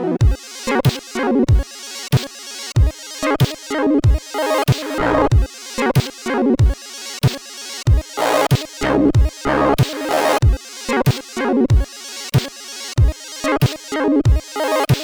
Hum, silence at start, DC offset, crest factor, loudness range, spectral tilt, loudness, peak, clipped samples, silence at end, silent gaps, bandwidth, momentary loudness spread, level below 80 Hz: none; 0 s; under 0.1%; 16 dB; 2 LU; -6 dB/octave; -18 LUFS; -2 dBFS; under 0.1%; 0 s; none; over 20 kHz; 9 LU; -24 dBFS